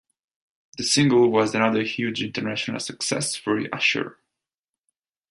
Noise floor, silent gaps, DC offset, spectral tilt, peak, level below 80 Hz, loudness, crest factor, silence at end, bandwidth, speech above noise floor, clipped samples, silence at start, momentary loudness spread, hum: -89 dBFS; none; under 0.1%; -4 dB/octave; -4 dBFS; -64 dBFS; -22 LUFS; 20 dB; 1.2 s; 11.5 kHz; 66 dB; under 0.1%; 0.75 s; 10 LU; none